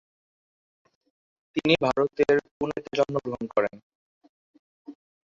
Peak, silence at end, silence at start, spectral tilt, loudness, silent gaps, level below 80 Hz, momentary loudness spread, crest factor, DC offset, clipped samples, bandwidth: -6 dBFS; 0.4 s; 1.55 s; -6 dB/octave; -26 LUFS; 2.51-2.60 s, 3.83-4.21 s, 4.29-4.85 s; -62 dBFS; 10 LU; 22 dB; under 0.1%; under 0.1%; 7.6 kHz